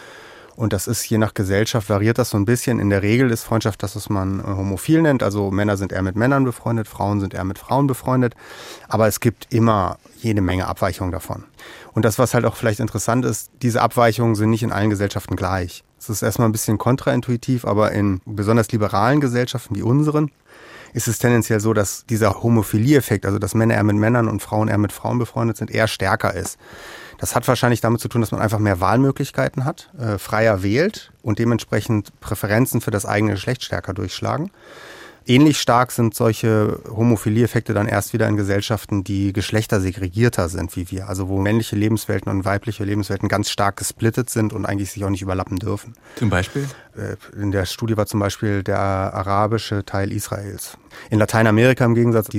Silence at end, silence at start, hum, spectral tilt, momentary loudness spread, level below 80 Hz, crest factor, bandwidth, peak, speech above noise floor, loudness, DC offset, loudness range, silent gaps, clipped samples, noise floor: 0 s; 0 s; none; -6 dB/octave; 10 LU; -50 dBFS; 18 dB; 16.5 kHz; -2 dBFS; 23 dB; -20 LUFS; under 0.1%; 4 LU; none; under 0.1%; -42 dBFS